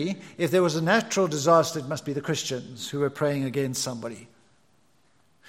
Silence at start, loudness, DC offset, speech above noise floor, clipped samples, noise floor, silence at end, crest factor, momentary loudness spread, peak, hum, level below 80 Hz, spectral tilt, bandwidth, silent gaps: 0 s; -25 LUFS; under 0.1%; 40 dB; under 0.1%; -66 dBFS; 1.25 s; 20 dB; 13 LU; -6 dBFS; none; -70 dBFS; -4.5 dB/octave; 16.5 kHz; none